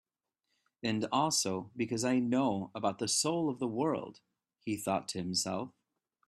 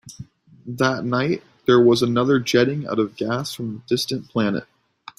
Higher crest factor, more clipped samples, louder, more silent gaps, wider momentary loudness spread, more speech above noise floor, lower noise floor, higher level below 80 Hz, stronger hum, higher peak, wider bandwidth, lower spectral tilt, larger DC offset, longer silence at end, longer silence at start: about the same, 18 dB vs 18 dB; neither; second, -33 LUFS vs -21 LUFS; neither; about the same, 10 LU vs 12 LU; first, 52 dB vs 22 dB; first, -85 dBFS vs -42 dBFS; second, -74 dBFS vs -58 dBFS; neither; second, -18 dBFS vs -4 dBFS; about the same, 14 kHz vs 15 kHz; second, -4 dB/octave vs -5.5 dB/octave; neither; about the same, 0.6 s vs 0.55 s; first, 0.85 s vs 0.05 s